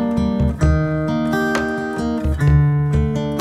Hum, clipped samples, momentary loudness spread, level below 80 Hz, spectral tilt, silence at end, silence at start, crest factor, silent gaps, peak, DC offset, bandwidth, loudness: none; under 0.1%; 6 LU; -26 dBFS; -8 dB/octave; 0 s; 0 s; 14 dB; none; -4 dBFS; under 0.1%; 13 kHz; -18 LUFS